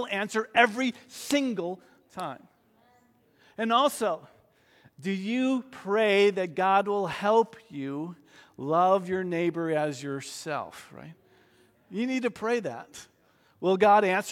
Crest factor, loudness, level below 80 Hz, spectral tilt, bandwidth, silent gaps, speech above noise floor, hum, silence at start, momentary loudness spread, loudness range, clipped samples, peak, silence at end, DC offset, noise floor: 22 dB; -27 LUFS; -74 dBFS; -4.5 dB/octave; 16.5 kHz; none; 37 dB; none; 0 s; 18 LU; 7 LU; under 0.1%; -6 dBFS; 0 s; under 0.1%; -64 dBFS